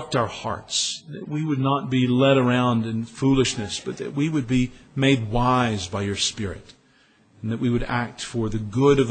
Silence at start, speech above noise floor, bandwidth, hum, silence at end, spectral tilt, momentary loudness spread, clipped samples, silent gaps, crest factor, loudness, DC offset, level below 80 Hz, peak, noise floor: 0 s; 36 dB; 9.2 kHz; none; 0 s; -5 dB/octave; 11 LU; under 0.1%; none; 18 dB; -23 LUFS; under 0.1%; -42 dBFS; -6 dBFS; -58 dBFS